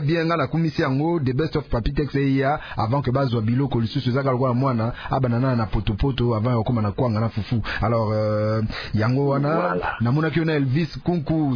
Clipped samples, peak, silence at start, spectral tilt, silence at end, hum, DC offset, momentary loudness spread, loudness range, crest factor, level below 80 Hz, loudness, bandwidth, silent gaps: under 0.1%; -8 dBFS; 0 s; -9 dB/octave; 0 s; none; under 0.1%; 4 LU; 1 LU; 14 dB; -38 dBFS; -22 LUFS; 5.4 kHz; none